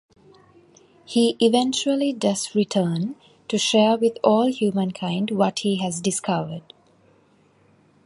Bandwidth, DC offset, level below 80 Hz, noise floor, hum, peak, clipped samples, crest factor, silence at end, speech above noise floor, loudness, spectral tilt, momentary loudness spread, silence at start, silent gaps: 11.5 kHz; under 0.1%; -68 dBFS; -58 dBFS; none; -2 dBFS; under 0.1%; 20 dB; 1.45 s; 37 dB; -22 LUFS; -4.5 dB/octave; 9 LU; 1.1 s; none